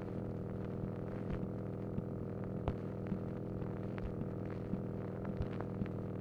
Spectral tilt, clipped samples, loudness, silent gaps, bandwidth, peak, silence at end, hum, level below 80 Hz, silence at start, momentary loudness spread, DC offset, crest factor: -10 dB/octave; under 0.1%; -42 LUFS; none; 6.2 kHz; -22 dBFS; 0 s; none; -54 dBFS; 0 s; 2 LU; under 0.1%; 20 dB